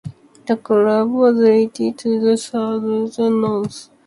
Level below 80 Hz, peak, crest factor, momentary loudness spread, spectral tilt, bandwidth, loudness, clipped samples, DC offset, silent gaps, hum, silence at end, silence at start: -60 dBFS; -2 dBFS; 14 dB; 10 LU; -6.5 dB/octave; 11.5 kHz; -17 LUFS; under 0.1%; under 0.1%; none; none; 0.25 s; 0.05 s